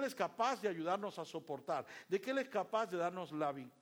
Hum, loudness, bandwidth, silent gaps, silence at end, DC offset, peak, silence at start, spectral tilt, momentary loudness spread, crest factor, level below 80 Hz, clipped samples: none; -40 LUFS; over 20 kHz; none; 0.1 s; under 0.1%; -22 dBFS; 0 s; -5 dB/octave; 7 LU; 18 dB; -88 dBFS; under 0.1%